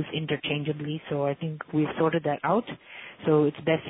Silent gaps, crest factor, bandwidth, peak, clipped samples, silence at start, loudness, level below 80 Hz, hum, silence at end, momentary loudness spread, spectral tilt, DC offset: none; 16 dB; 4 kHz; -10 dBFS; under 0.1%; 0 s; -27 LUFS; -64 dBFS; none; 0 s; 10 LU; -10.5 dB/octave; under 0.1%